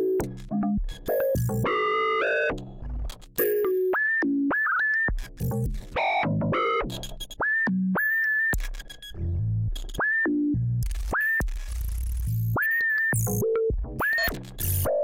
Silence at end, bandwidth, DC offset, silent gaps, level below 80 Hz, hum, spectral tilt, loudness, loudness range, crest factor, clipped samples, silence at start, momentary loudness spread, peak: 0 s; 17 kHz; under 0.1%; none; -36 dBFS; none; -5.5 dB/octave; -25 LUFS; 2 LU; 14 dB; under 0.1%; 0 s; 10 LU; -10 dBFS